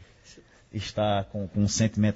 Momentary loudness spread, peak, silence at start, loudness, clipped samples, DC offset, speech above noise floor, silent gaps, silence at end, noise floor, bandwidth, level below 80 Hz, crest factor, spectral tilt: 11 LU; -10 dBFS; 0.3 s; -27 LUFS; under 0.1%; under 0.1%; 28 dB; none; 0 s; -54 dBFS; 8 kHz; -50 dBFS; 18 dB; -5.5 dB/octave